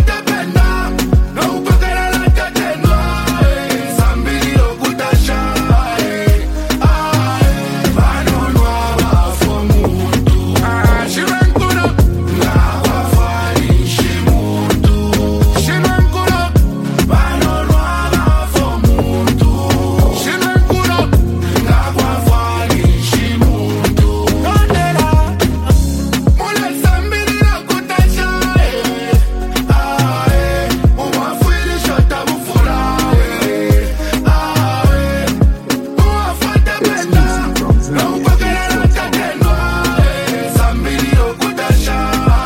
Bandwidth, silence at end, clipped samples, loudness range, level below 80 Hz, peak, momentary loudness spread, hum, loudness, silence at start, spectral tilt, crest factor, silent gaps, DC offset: 16.5 kHz; 0 s; under 0.1%; 1 LU; -16 dBFS; 0 dBFS; 3 LU; none; -13 LUFS; 0 s; -5.5 dB/octave; 12 dB; none; under 0.1%